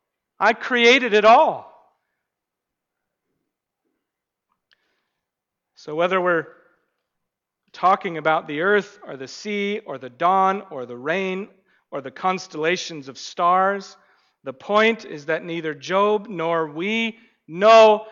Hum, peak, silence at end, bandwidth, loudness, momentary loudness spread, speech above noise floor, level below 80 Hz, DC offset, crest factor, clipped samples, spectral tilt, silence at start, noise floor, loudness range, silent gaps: none; -4 dBFS; 0 s; 7.4 kHz; -19 LUFS; 20 LU; 63 dB; -70 dBFS; under 0.1%; 16 dB; under 0.1%; -4 dB/octave; 0.4 s; -83 dBFS; 8 LU; none